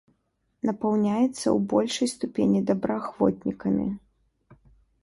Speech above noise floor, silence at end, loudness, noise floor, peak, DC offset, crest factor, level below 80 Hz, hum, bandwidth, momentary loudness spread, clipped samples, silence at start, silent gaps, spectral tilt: 48 dB; 0.5 s; -26 LUFS; -73 dBFS; -8 dBFS; under 0.1%; 18 dB; -58 dBFS; none; 11.5 kHz; 7 LU; under 0.1%; 0.65 s; none; -6 dB/octave